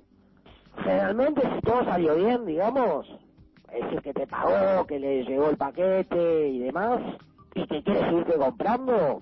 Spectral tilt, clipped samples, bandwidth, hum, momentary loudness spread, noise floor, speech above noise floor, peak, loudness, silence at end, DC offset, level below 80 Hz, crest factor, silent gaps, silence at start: -9.5 dB/octave; under 0.1%; 5.8 kHz; none; 8 LU; -57 dBFS; 32 dB; -14 dBFS; -25 LUFS; 0 s; under 0.1%; -56 dBFS; 12 dB; none; 0.75 s